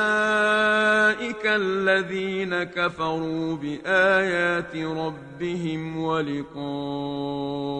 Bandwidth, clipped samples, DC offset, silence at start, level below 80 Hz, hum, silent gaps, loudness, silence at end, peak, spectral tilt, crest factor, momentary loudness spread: 9.4 kHz; under 0.1%; under 0.1%; 0 s; -58 dBFS; none; none; -24 LUFS; 0 s; -6 dBFS; -5 dB/octave; 18 dB; 11 LU